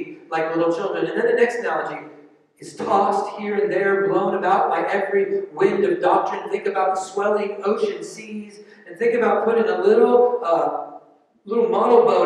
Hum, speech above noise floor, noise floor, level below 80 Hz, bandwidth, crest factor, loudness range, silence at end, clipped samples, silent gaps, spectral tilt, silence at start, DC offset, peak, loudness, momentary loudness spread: none; 28 dB; -47 dBFS; -74 dBFS; 10.5 kHz; 18 dB; 3 LU; 0 s; under 0.1%; none; -5.5 dB/octave; 0 s; under 0.1%; -2 dBFS; -20 LUFS; 15 LU